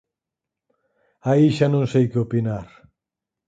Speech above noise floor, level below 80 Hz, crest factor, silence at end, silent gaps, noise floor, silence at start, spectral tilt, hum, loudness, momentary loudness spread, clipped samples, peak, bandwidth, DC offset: 67 dB; -56 dBFS; 18 dB; 0.85 s; none; -86 dBFS; 1.25 s; -8.5 dB/octave; none; -20 LUFS; 12 LU; under 0.1%; -4 dBFS; 9 kHz; under 0.1%